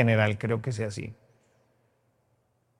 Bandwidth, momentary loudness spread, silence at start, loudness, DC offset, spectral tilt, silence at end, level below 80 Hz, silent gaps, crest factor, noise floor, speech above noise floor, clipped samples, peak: 10.5 kHz; 15 LU; 0 s; -28 LUFS; under 0.1%; -7 dB/octave; 1.65 s; -64 dBFS; none; 24 dB; -71 dBFS; 44 dB; under 0.1%; -6 dBFS